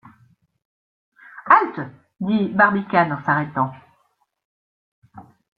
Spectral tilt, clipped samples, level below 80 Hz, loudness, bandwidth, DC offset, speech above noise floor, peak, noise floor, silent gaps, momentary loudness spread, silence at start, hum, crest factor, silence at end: -9 dB/octave; under 0.1%; -64 dBFS; -19 LUFS; 5.2 kHz; under 0.1%; 46 dB; -2 dBFS; -67 dBFS; 4.45-5.02 s; 16 LU; 1.35 s; none; 22 dB; 0.35 s